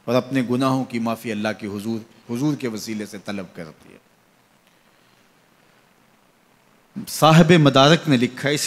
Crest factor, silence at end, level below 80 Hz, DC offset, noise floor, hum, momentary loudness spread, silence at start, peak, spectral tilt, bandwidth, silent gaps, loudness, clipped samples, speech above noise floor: 20 dB; 0 s; -56 dBFS; under 0.1%; -58 dBFS; none; 19 LU; 0.05 s; -2 dBFS; -5.5 dB/octave; 15.5 kHz; none; -19 LUFS; under 0.1%; 39 dB